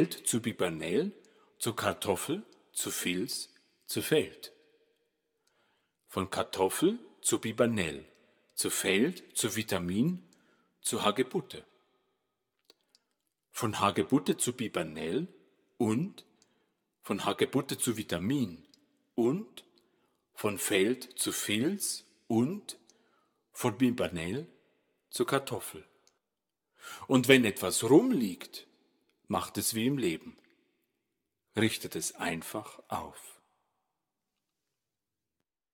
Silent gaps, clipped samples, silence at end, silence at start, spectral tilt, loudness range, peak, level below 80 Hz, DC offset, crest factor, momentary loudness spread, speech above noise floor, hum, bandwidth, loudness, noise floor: none; under 0.1%; 2.4 s; 0 s; -4 dB/octave; 8 LU; -4 dBFS; -70 dBFS; under 0.1%; 28 dB; 14 LU; 58 dB; none; over 20 kHz; -31 LUFS; -89 dBFS